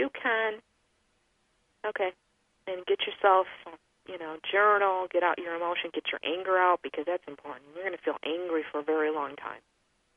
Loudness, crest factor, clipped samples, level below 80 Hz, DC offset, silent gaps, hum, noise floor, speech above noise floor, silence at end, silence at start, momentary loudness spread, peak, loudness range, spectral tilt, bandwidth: -29 LUFS; 20 dB; under 0.1%; -76 dBFS; under 0.1%; none; none; -72 dBFS; 43 dB; 0.6 s; 0 s; 19 LU; -10 dBFS; 5 LU; -5 dB/octave; 5.2 kHz